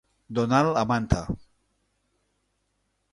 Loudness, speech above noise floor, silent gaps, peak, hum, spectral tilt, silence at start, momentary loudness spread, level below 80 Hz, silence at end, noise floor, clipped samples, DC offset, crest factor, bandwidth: -25 LUFS; 50 dB; none; -6 dBFS; 50 Hz at -55 dBFS; -6.5 dB/octave; 0.3 s; 13 LU; -42 dBFS; 1.75 s; -74 dBFS; under 0.1%; under 0.1%; 22 dB; 11.5 kHz